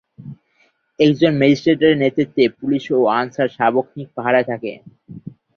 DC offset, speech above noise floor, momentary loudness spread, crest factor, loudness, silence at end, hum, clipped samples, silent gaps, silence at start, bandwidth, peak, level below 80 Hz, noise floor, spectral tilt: under 0.1%; 44 dB; 20 LU; 16 dB; -17 LUFS; 0.25 s; none; under 0.1%; none; 0.2 s; 6.8 kHz; -2 dBFS; -58 dBFS; -61 dBFS; -7 dB/octave